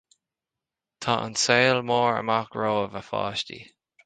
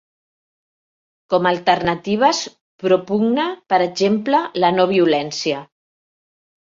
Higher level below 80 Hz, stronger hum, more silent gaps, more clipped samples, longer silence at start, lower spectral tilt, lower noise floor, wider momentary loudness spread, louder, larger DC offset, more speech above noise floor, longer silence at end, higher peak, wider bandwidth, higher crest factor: about the same, -62 dBFS vs -58 dBFS; neither; second, none vs 2.61-2.79 s; neither; second, 1 s vs 1.3 s; second, -3.5 dB/octave vs -5 dB/octave; about the same, -88 dBFS vs under -90 dBFS; first, 12 LU vs 8 LU; second, -24 LUFS vs -18 LUFS; neither; second, 64 dB vs over 73 dB; second, 0.4 s vs 1.1 s; about the same, -4 dBFS vs -2 dBFS; first, 9.6 kHz vs 7.6 kHz; about the same, 22 dB vs 18 dB